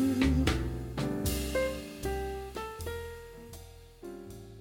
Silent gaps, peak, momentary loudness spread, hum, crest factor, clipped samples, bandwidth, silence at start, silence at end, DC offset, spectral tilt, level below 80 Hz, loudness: none; -12 dBFS; 20 LU; none; 20 dB; under 0.1%; 17.5 kHz; 0 s; 0 s; under 0.1%; -5.5 dB/octave; -40 dBFS; -33 LUFS